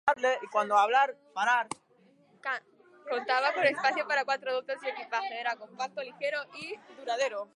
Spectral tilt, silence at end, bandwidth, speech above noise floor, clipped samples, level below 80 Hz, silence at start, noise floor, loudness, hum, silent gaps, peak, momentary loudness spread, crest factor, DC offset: -2 dB/octave; 0.1 s; 11.5 kHz; 33 dB; under 0.1%; -82 dBFS; 0.05 s; -63 dBFS; -30 LUFS; none; none; -12 dBFS; 14 LU; 20 dB; under 0.1%